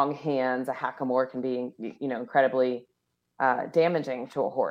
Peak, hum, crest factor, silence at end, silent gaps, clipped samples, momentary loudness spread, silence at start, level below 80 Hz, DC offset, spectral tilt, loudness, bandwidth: -8 dBFS; none; 20 dB; 0 s; none; under 0.1%; 8 LU; 0 s; -80 dBFS; under 0.1%; -7 dB/octave; -28 LUFS; 10.5 kHz